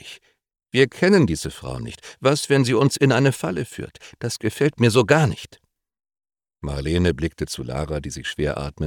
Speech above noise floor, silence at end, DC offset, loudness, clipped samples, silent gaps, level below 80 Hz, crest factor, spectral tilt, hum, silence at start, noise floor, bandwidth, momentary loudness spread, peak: 24 dB; 0 s; under 0.1%; -21 LUFS; under 0.1%; none; -42 dBFS; 20 dB; -5.5 dB/octave; none; 0.05 s; -45 dBFS; 18 kHz; 16 LU; -2 dBFS